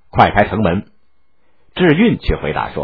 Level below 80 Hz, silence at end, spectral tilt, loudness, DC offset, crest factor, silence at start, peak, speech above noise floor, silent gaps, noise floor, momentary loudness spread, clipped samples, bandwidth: -32 dBFS; 0 s; -9.5 dB/octave; -15 LUFS; 0.5%; 16 dB; 0.15 s; 0 dBFS; 50 dB; none; -63 dBFS; 9 LU; 0.1%; 5.4 kHz